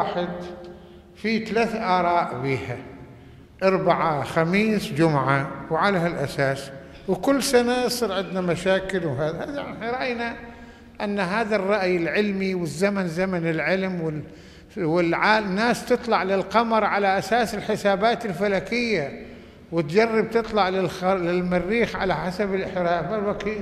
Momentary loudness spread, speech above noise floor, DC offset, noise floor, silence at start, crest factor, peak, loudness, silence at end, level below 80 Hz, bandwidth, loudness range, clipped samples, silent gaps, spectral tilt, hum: 11 LU; 23 dB; under 0.1%; -46 dBFS; 0 s; 20 dB; -4 dBFS; -23 LUFS; 0 s; -50 dBFS; 14.5 kHz; 4 LU; under 0.1%; none; -5.5 dB/octave; none